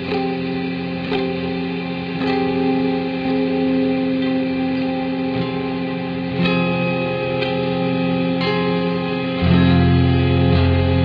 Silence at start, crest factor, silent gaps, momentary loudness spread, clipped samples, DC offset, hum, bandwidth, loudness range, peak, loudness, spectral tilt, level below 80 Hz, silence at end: 0 s; 16 dB; none; 8 LU; under 0.1%; under 0.1%; none; 5.2 kHz; 3 LU; -4 dBFS; -19 LUFS; -9.5 dB/octave; -38 dBFS; 0 s